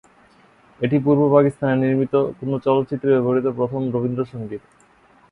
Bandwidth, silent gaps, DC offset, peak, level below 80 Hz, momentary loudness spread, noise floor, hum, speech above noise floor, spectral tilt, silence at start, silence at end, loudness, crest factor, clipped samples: 10.5 kHz; none; under 0.1%; -2 dBFS; -58 dBFS; 11 LU; -54 dBFS; none; 35 dB; -9.5 dB/octave; 0.8 s; 0.75 s; -20 LUFS; 20 dB; under 0.1%